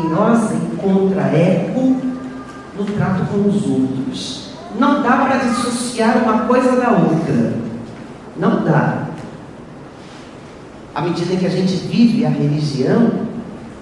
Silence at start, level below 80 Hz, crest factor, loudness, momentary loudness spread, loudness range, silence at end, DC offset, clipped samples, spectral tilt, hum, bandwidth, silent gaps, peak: 0 s; -50 dBFS; 16 dB; -16 LUFS; 19 LU; 6 LU; 0 s; under 0.1%; under 0.1%; -6.5 dB/octave; none; 11.5 kHz; none; 0 dBFS